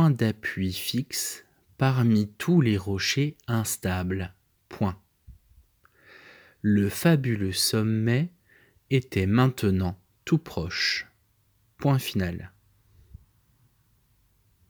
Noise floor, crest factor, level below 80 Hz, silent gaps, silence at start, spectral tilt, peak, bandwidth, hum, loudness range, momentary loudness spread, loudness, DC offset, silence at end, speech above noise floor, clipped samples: -66 dBFS; 20 dB; -56 dBFS; none; 0 s; -5.5 dB/octave; -6 dBFS; over 20 kHz; none; 7 LU; 10 LU; -26 LUFS; under 0.1%; 2.2 s; 42 dB; under 0.1%